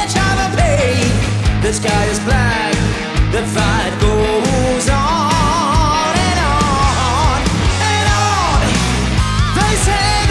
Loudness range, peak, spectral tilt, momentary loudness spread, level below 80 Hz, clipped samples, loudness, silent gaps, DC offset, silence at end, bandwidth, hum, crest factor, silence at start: 1 LU; -2 dBFS; -4.5 dB/octave; 2 LU; -20 dBFS; under 0.1%; -14 LUFS; none; under 0.1%; 0 s; 12 kHz; none; 12 dB; 0 s